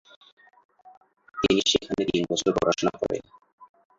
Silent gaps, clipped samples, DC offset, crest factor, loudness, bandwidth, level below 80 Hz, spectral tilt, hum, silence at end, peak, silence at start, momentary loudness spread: 3.53-3.58 s; under 0.1%; under 0.1%; 20 dB; -25 LUFS; 7.8 kHz; -54 dBFS; -4 dB/octave; none; 0.35 s; -8 dBFS; 1.35 s; 9 LU